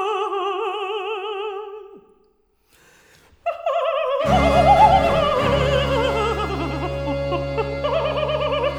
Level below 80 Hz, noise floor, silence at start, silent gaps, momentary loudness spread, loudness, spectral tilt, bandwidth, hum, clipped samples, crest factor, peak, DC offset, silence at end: -34 dBFS; -62 dBFS; 0 s; none; 13 LU; -20 LUFS; -6 dB/octave; 15.5 kHz; none; under 0.1%; 18 dB; -2 dBFS; under 0.1%; 0 s